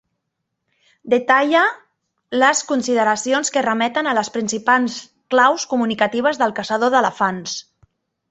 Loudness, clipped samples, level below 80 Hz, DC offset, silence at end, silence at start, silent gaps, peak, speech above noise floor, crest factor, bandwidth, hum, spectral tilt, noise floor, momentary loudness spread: -18 LUFS; under 0.1%; -66 dBFS; under 0.1%; 0.7 s; 1.05 s; none; -2 dBFS; 59 dB; 18 dB; 8.4 kHz; none; -3 dB/octave; -77 dBFS; 9 LU